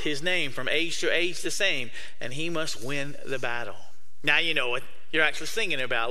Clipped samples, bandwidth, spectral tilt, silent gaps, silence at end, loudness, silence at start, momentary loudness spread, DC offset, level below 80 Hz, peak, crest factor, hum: under 0.1%; 15.5 kHz; -2.5 dB/octave; none; 0 s; -27 LUFS; 0 s; 10 LU; 5%; -60 dBFS; -6 dBFS; 22 dB; none